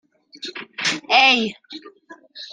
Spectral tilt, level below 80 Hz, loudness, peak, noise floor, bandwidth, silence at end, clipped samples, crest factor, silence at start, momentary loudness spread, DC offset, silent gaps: -1.5 dB/octave; -70 dBFS; -17 LUFS; 0 dBFS; -41 dBFS; 10 kHz; 0.05 s; under 0.1%; 22 dB; 0.4 s; 24 LU; under 0.1%; none